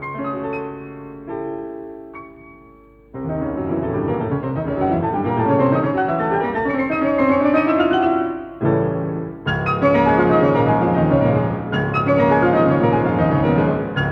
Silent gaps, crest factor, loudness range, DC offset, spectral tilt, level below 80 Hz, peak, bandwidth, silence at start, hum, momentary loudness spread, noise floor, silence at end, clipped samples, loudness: none; 16 dB; 11 LU; under 0.1%; -9.5 dB/octave; -42 dBFS; -4 dBFS; 6 kHz; 0 s; none; 15 LU; -46 dBFS; 0 s; under 0.1%; -18 LUFS